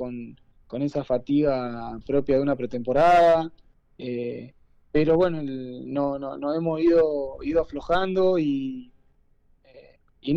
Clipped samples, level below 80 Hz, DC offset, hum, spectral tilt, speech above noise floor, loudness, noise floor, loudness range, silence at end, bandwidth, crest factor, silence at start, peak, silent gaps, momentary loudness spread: under 0.1%; -48 dBFS; under 0.1%; none; -8 dB/octave; 37 dB; -24 LUFS; -61 dBFS; 4 LU; 0 s; 8.4 kHz; 12 dB; 0 s; -12 dBFS; none; 15 LU